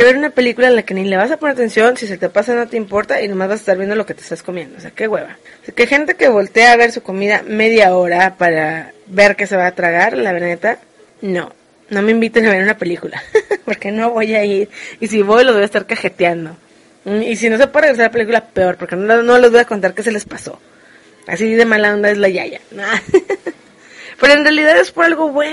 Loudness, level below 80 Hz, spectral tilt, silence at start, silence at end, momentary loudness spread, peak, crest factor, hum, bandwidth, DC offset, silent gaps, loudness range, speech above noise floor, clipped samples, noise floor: -13 LUFS; -54 dBFS; -4.5 dB/octave; 0 s; 0 s; 14 LU; 0 dBFS; 14 dB; none; 11.5 kHz; under 0.1%; none; 5 LU; 31 dB; under 0.1%; -45 dBFS